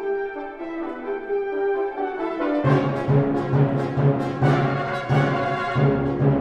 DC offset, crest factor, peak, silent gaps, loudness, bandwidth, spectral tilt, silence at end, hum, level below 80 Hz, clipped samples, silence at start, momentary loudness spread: under 0.1%; 16 dB; -6 dBFS; none; -23 LUFS; 6.8 kHz; -9 dB/octave; 0 s; none; -50 dBFS; under 0.1%; 0 s; 10 LU